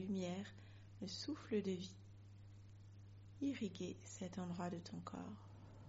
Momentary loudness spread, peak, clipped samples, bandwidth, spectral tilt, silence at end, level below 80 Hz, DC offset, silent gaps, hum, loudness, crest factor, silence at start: 18 LU; -30 dBFS; under 0.1%; 7.6 kHz; -6 dB/octave; 0 s; -74 dBFS; under 0.1%; none; none; -47 LUFS; 18 dB; 0 s